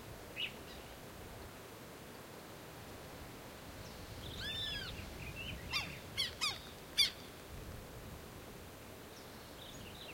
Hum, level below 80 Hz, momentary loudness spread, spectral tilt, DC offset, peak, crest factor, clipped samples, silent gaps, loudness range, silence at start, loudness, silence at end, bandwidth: none; -58 dBFS; 15 LU; -2.5 dB/octave; under 0.1%; -18 dBFS; 26 dB; under 0.1%; none; 12 LU; 0 s; -43 LUFS; 0 s; 16.5 kHz